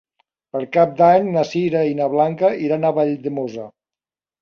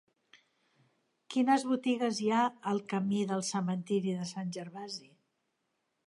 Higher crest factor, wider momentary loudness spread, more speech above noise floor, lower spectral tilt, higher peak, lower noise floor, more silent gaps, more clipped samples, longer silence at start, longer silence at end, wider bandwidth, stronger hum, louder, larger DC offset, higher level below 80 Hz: about the same, 16 dB vs 20 dB; about the same, 15 LU vs 13 LU; first, over 73 dB vs 49 dB; first, -7.5 dB/octave vs -5.5 dB/octave; first, -2 dBFS vs -14 dBFS; first, under -90 dBFS vs -81 dBFS; neither; neither; second, 0.55 s vs 1.3 s; second, 0.7 s vs 1.1 s; second, 7 kHz vs 11.5 kHz; neither; first, -18 LUFS vs -32 LUFS; neither; first, -62 dBFS vs -82 dBFS